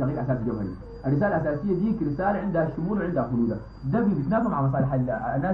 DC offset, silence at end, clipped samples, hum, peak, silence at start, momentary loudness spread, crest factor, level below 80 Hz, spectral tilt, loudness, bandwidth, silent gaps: 0.1%; 0 s; under 0.1%; none; -10 dBFS; 0 s; 5 LU; 14 dB; -44 dBFS; -11.5 dB/octave; -26 LUFS; 5 kHz; none